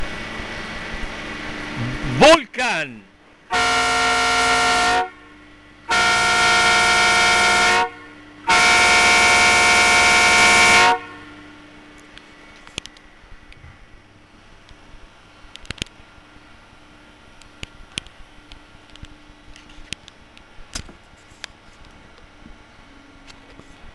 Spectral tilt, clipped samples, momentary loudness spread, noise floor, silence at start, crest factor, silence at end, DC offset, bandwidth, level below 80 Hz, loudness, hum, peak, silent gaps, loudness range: -1.5 dB/octave; under 0.1%; 23 LU; -48 dBFS; 0 s; 16 dB; 0.05 s; under 0.1%; 12.5 kHz; -42 dBFS; -14 LUFS; none; -4 dBFS; none; 24 LU